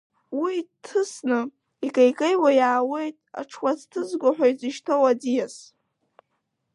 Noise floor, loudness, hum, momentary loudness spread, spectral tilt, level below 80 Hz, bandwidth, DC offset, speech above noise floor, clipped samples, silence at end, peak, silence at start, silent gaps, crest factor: -76 dBFS; -23 LUFS; none; 14 LU; -4 dB/octave; -82 dBFS; 11 kHz; under 0.1%; 53 dB; under 0.1%; 1.15 s; -6 dBFS; 0.3 s; none; 18 dB